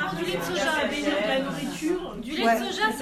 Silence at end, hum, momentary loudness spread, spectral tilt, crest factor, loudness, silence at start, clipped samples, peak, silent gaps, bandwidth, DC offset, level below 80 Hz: 0 s; none; 6 LU; -4 dB/octave; 16 dB; -26 LUFS; 0 s; under 0.1%; -10 dBFS; none; 15.5 kHz; under 0.1%; -52 dBFS